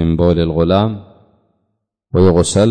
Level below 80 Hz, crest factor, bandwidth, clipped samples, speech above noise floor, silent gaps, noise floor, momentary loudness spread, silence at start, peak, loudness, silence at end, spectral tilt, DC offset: -32 dBFS; 12 dB; 9.6 kHz; under 0.1%; 58 dB; none; -70 dBFS; 9 LU; 0 s; -2 dBFS; -14 LUFS; 0 s; -6.5 dB/octave; under 0.1%